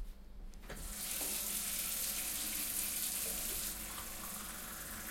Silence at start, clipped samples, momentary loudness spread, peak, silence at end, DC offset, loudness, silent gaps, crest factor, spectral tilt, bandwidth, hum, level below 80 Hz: 0 s; under 0.1%; 13 LU; -22 dBFS; 0 s; under 0.1%; -38 LUFS; none; 20 dB; -0.5 dB/octave; 16.5 kHz; none; -54 dBFS